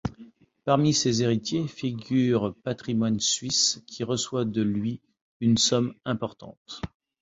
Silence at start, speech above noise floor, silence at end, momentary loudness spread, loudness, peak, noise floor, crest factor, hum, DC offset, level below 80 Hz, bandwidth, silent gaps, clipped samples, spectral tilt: 0.05 s; 26 dB; 0.35 s; 15 LU; -25 LUFS; -6 dBFS; -51 dBFS; 20 dB; none; under 0.1%; -54 dBFS; 8 kHz; 5.21-5.40 s, 6.57-6.65 s; under 0.1%; -4.5 dB/octave